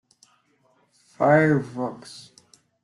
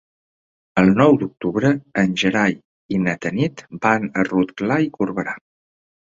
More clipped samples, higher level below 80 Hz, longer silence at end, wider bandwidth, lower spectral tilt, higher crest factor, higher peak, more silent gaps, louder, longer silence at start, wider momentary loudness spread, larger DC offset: neither; second, -66 dBFS vs -54 dBFS; about the same, 0.65 s vs 0.75 s; first, 11.5 kHz vs 7.6 kHz; about the same, -7.5 dB/octave vs -6.5 dB/octave; about the same, 20 dB vs 18 dB; second, -6 dBFS vs -2 dBFS; second, none vs 2.65-2.89 s; second, -22 LUFS vs -19 LUFS; first, 1.2 s vs 0.75 s; first, 24 LU vs 9 LU; neither